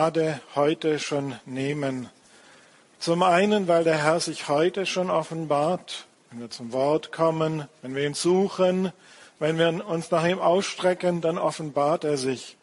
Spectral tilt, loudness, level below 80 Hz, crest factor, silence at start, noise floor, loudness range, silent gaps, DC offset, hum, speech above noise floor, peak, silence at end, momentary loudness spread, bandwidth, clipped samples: -5 dB/octave; -25 LUFS; -70 dBFS; 20 dB; 0 s; -55 dBFS; 3 LU; none; under 0.1%; none; 30 dB; -6 dBFS; 0.1 s; 11 LU; 11.5 kHz; under 0.1%